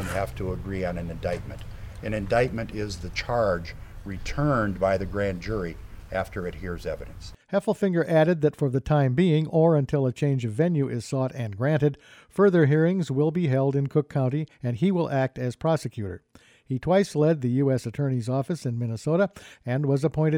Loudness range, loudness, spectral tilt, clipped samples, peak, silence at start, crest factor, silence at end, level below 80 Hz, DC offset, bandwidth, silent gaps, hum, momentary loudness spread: 6 LU; -25 LUFS; -7.5 dB/octave; under 0.1%; -10 dBFS; 0 s; 16 dB; 0 s; -44 dBFS; under 0.1%; 13.5 kHz; none; none; 13 LU